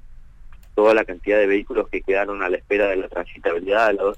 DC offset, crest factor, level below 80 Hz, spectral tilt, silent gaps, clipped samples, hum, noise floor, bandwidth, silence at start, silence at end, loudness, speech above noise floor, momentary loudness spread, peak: under 0.1%; 14 dB; -42 dBFS; -5.5 dB/octave; none; under 0.1%; none; -41 dBFS; 8.8 kHz; 0.05 s; 0 s; -20 LUFS; 21 dB; 8 LU; -8 dBFS